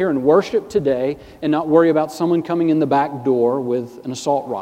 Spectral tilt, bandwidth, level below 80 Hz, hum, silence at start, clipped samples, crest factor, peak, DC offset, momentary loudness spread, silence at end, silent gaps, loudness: -6.5 dB/octave; 15 kHz; -56 dBFS; none; 0 s; under 0.1%; 16 dB; -2 dBFS; under 0.1%; 9 LU; 0 s; none; -18 LUFS